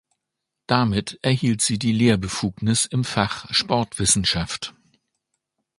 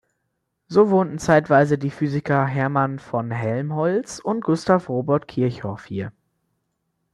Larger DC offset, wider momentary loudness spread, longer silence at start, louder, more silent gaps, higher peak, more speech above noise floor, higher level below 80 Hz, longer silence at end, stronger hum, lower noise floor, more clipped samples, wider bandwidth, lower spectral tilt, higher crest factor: neither; second, 6 LU vs 11 LU; about the same, 0.7 s vs 0.7 s; about the same, -21 LUFS vs -21 LUFS; neither; about the same, 0 dBFS vs -2 dBFS; first, 61 dB vs 55 dB; first, -46 dBFS vs -56 dBFS; about the same, 1.1 s vs 1.05 s; neither; first, -82 dBFS vs -75 dBFS; neither; about the same, 11.5 kHz vs 11.5 kHz; second, -4 dB/octave vs -7 dB/octave; about the same, 22 dB vs 20 dB